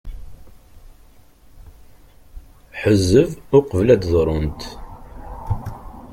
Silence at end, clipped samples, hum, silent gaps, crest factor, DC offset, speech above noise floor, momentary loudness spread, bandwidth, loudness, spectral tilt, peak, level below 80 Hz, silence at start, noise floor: 0 s; under 0.1%; none; none; 20 dB; under 0.1%; 31 dB; 24 LU; 16 kHz; -18 LUFS; -7 dB/octave; -2 dBFS; -36 dBFS; 0.05 s; -48 dBFS